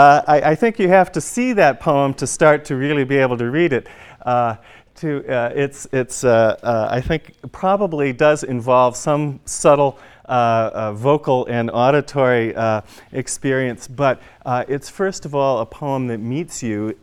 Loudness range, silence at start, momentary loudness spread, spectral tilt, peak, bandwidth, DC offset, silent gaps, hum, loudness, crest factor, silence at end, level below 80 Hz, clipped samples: 5 LU; 0 s; 10 LU; -5.5 dB/octave; 0 dBFS; 14 kHz; under 0.1%; none; none; -18 LUFS; 18 dB; 0.1 s; -48 dBFS; under 0.1%